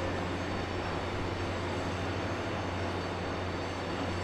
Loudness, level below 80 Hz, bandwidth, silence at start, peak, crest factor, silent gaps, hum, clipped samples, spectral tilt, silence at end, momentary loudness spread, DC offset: -35 LUFS; -50 dBFS; 12 kHz; 0 s; -22 dBFS; 12 dB; none; none; under 0.1%; -5.5 dB/octave; 0 s; 1 LU; under 0.1%